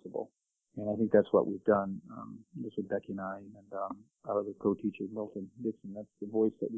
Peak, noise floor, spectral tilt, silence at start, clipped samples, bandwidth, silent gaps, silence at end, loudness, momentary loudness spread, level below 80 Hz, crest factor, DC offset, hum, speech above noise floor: -12 dBFS; -72 dBFS; -10 dB/octave; 0.05 s; under 0.1%; 3.7 kHz; none; 0 s; -34 LUFS; 18 LU; -70 dBFS; 22 dB; under 0.1%; none; 39 dB